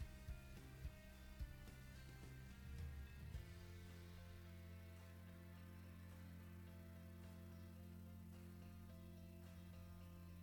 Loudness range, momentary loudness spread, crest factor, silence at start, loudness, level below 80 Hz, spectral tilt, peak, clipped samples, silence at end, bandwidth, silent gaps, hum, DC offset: 2 LU; 4 LU; 16 dB; 0 s; -59 LUFS; -62 dBFS; -6 dB/octave; -40 dBFS; under 0.1%; 0 s; 19 kHz; none; none; under 0.1%